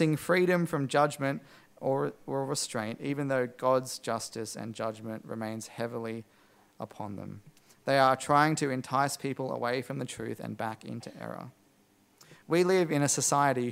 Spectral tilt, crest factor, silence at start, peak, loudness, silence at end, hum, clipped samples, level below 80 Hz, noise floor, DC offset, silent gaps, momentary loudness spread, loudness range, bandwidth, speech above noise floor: -4.5 dB/octave; 22 dB; 0 s; -8 dBFS; -30 LUFS; 0 s; none; under 0.1%; -74 dBFS; -65 dBFS; under 0.1%; none; 16 LU; 8 LU; 16 kHz; 35 dB